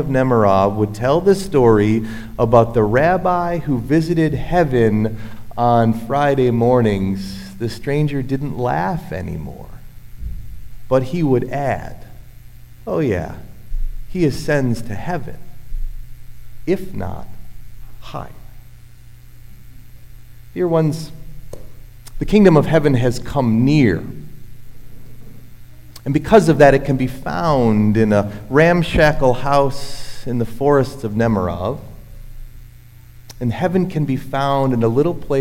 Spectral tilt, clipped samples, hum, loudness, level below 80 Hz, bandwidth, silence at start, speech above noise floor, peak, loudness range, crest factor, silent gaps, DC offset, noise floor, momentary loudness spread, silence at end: -7.5 dB/octave; under 0.1%; none; -17 LUFS; -32 dBFS; 16.5 kHz; 0 s; 25 dB; 0 dBFS; 10 LU; 18 dB; none; under 0.1%; -41 dBFS; 19 LU; 0 s